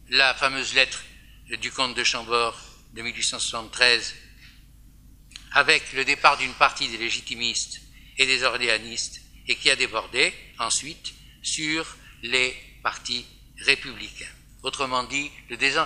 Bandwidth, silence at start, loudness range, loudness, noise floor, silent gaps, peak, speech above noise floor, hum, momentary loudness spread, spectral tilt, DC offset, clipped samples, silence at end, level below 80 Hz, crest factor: 15.5 kHz; 0.1 s; 4 LU; -23 LUFS; -50 dBFS; none; 0 dBFS; 25 dB; none; 17 LU; -0.5 dB/octave; under 0.1%; under 0.1%; 0 s; -52 dBFS; 26 dB